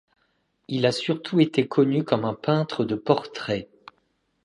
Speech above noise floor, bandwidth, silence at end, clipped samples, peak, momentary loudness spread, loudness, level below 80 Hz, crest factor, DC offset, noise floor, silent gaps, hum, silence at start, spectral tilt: 47 dB; 11 kHz; 0.8 s; under 0.1%; -2 dBFS; 8 LU; -24 LUFS; -64 dBFS; 22 dB; under 0.1%; -70 dBFS; none; none; 0.7 s; -6.5 dB/octave